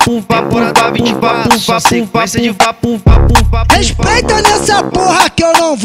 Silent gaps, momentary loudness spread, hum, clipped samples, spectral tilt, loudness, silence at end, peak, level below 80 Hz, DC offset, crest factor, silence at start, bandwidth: none; 4 LU; none; 0.5%; -4 dB/octave; -10 LUFS; 0 s; 0 dBFS; -18 dBFS; 0.2%; 10 dB; 0 s; 16.5 kHz